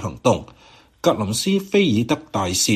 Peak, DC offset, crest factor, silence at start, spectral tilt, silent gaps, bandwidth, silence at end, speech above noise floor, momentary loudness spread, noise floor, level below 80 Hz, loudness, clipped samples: -2 dBFS; under 0.1%; 18 dB; 0 s; -4.5 dB/octave; none; 15 kHz; 0 s; 20 dB; 5 LU; -39 dBFS; -50 dBFS; -20 LUFS; under 0.1%